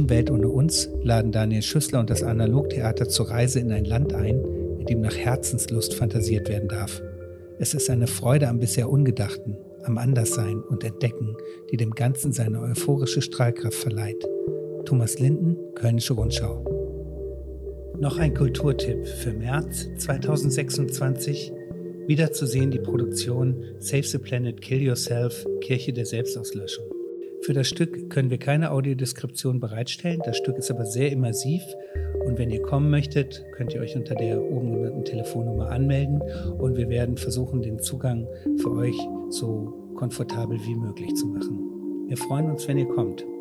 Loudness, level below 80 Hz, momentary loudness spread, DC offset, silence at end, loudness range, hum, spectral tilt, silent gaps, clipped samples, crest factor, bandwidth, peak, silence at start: -25 LUFS; -40 dBFS; 10 LU; under 0.1%; 0 s; 4 LU; none; -5.5 dB/octave; none; under 0.1%; 18 dB; 14 kHz; -8 dBFS; 0 s